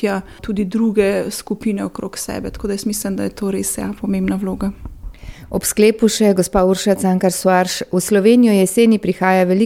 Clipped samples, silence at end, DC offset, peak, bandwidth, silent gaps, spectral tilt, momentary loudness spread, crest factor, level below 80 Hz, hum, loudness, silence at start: under 0.1%; 0 s; 0.2%; -2 dBFS; 16.5 kHz; none; -5 dB/octave; 12 LU; 14 dB; -40 dBFS; none; -17 LUFS; 0 s